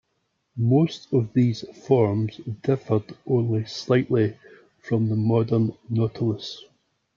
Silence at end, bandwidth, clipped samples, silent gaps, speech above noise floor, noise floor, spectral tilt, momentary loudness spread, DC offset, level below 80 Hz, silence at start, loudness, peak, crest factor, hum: 0.55 s; 7.2 kHz; under 0.1%; none; 51 dB; -74 dBFS; -8 dB/octave; 9 LU; under 0.1%; -64 dBFS; 0.55 s; -24 LUFS; -6 dBFS; 18 dB; none